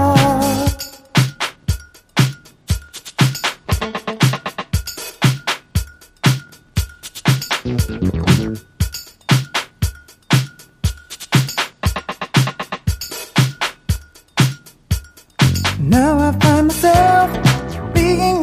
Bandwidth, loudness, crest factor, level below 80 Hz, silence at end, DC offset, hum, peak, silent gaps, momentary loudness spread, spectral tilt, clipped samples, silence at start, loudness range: 15.5 kHz; -18 LUFS; 18 dB; -30 dBFS; 0 s; under 0.1%; none; 0 dBFS; none; 11 LU; -5 dB/octave; under 0.1%; 0 s; 6 LU